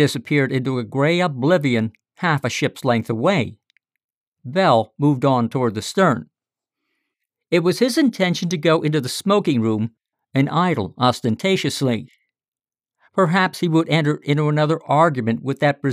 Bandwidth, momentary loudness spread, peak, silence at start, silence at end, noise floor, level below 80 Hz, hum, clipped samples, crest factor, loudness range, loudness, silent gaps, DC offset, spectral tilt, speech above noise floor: 15.5 kHz; 6 LU; -4 dBFS; 0 s; 0 s; under -90 dBFS; -66 dBFS; none; under 0.1%; 16 dB; 2 LU; -19 LUFS; 4.04-4.09 s, 4.17-4.32 s, 12.48-12.52 s; under 0.1%; -6 dB/octave; over 71 dB